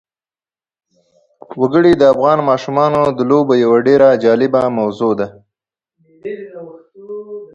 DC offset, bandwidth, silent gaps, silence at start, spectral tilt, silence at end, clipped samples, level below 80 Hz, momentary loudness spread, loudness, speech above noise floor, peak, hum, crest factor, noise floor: under 0.1%; 7.8 kHz; none; 1.5 s; -7.5 dB/octave; 0.1 s; under 0.1%; -54 dBFS; 20 LU; -12 LUFS; over 78 dB; 0 dBFS; none; 14 dB; under -90 dBFS